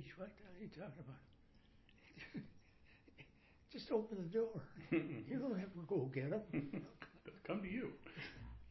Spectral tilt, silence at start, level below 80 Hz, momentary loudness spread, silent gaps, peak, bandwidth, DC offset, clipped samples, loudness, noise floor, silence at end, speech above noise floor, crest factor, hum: -6.5 dB/octave; 0 s; -68 dBFS; 19 LU; none; -26 dBFS; 6 kHz; under 0.1%; under 0.1%; -46 LUFS; -68 dBFS; 0 s; 23 dB; 20 dB; none